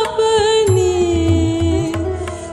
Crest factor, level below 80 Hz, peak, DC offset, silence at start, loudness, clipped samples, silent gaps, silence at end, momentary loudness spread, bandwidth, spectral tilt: 12 dB; -28 dBFS; -4 dBFS; under 0.1%; 0 s; -16 LUFS; under 0.1%; none; 0 s; 8 LU; 12 kHz; -5.5 dB/octave